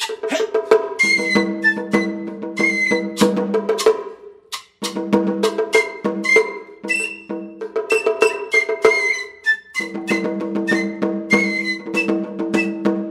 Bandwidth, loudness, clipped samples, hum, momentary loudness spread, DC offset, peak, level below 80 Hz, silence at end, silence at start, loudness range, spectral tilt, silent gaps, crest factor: 15.5 kHz; -18 LUFS; under 0.1%; none; 11 LU; under 0.1%; 0 dBFS; -62 dBFS; 0 s; 0 s; 2 LU; -4 dB/octave; none; 20 dB